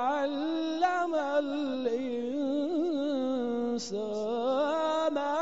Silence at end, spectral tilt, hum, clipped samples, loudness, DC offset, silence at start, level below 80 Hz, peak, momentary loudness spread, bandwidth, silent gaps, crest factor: 0 s; -2.5 dB/octave; none; under 0.1%; -30 LUFS; 0.2%; 0 s; -72 dBFS; -16 dBFS; 4 LU; 7.6 kHz; none; 14 dB